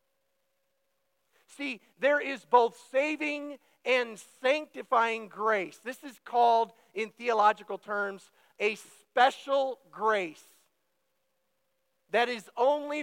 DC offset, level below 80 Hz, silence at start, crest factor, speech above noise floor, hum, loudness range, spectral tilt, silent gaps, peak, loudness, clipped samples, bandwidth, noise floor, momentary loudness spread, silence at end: under 0.1%; under -90 dBFS; 1.6 s; 22 dB; 50 dB; none; 3 LU; -3 dB/octave; none; -10 dBFS; -29 LUFS; under 0.1%; 16.5 kHz; -79 dBFS; 13 LU; 0 s